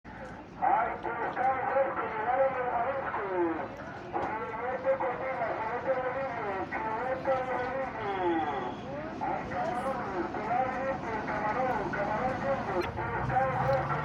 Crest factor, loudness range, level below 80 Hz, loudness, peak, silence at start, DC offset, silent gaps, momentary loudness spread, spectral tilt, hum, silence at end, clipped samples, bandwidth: 16 dB; 2 LU; -54 dBFS; -32 LUFS; -14 dBFS; 0.05 s; under 0.1%; none; 6 LU; -7 dB/octave; none; 0 s; under 0.1%; 10.5 kHz